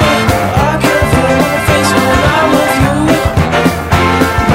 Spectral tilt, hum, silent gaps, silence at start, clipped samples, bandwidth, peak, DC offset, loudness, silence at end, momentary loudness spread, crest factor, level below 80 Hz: -5 dB/octave; none; none; 0 s; under 0.1%; 16.5 kHz; 0 dBFS; 0.4%; -10 LUFS; 0 s; 2 LU; 10 dB; -24 dBFS